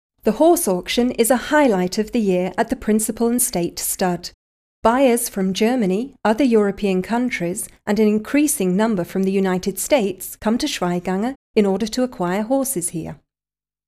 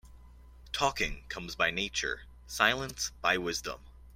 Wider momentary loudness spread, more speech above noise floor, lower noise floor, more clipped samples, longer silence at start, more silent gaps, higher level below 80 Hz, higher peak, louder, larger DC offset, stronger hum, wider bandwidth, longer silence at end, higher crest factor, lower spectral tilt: second, 7 LU vs 14 LU; first, over 71 dB vs 21 dB; first, under -90 dBFS vs -53 dBFS; neither; first, 0.25 s vs 0.05 s; first, 4.34-4.82 s, 11.36-11.54 s vs none; about the same, -48 dBFS vs -50 dBFS; first, -2 dBFS vs -8 dBFS; first, -19 LUFS vs -31 LUFS; neither; neither; about the same, 15.5 kHz vs 16.5 kHz; first, 0.75 s vs 0 s; second, 16 dB vs 26 dB; first, -4.5 dB/octave vs -2 dB/octave